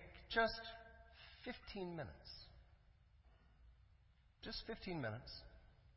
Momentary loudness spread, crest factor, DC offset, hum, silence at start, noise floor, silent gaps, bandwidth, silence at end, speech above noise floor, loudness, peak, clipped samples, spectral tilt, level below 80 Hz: 22 LU; 24 dB; under 0.1%; none; 0 s; -71 dBFS; none; 5.8 kHz; 0 s; 25 dB; -46 LUFS; -24 dBFS; under 0.1%; -2.5 dB/octave; -64 dBFS